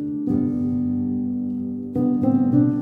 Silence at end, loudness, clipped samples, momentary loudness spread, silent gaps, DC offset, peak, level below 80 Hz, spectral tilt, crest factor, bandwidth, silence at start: 0 s; -22 LUFS; under 0.1%; 8 LU; none; under 0.1%; -6 dBFS; -52 dBFS; -12 dB/octave; 14 dB; 2.2 kHz; 0 s